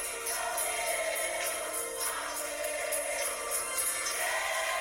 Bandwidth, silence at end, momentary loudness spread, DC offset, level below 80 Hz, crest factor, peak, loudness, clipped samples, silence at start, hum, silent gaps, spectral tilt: over 20 kHz; 0 s; 4 LU; under 0.1%; -64 dBFS; 16 dB; -16 dBFS; -31 LUFS; under 0.1%; 0 s; none; none; 1 dB/octave